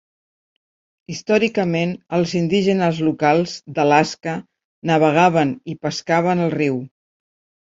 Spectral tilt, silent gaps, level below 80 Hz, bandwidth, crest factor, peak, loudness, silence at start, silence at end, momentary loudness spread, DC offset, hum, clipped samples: -6 dB/octave; 4.65-4.82 s; -60 dBFS; 7.8 kHz; 18 dB; -2 dBFS; -19 LUFS; 1.1 s; 0.8 s; 12 LU; under 0.1%; none; under 0.1%